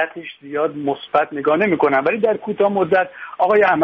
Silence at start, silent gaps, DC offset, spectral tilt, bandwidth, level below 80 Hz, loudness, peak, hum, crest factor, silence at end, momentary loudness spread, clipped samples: 0 s; none; under 0.1%; -8 dB/octave; 5.8 kHz; -62 dBFS; -18 LUFS; -4 dBFS; none; 14 dB; 0 s; 9 LU; under 0.1%